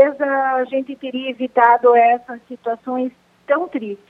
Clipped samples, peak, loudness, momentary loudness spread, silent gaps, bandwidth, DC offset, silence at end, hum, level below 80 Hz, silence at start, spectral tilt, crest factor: under 0.1%; 0 dBFS; -18 LUFS; 14 LU; none; 4.7 kHz; under 0.1%; 0.15 s; 60 Hz at -65 dBFS; -72 dBFS; 0 s; -6.5 dB/octave; 18 dB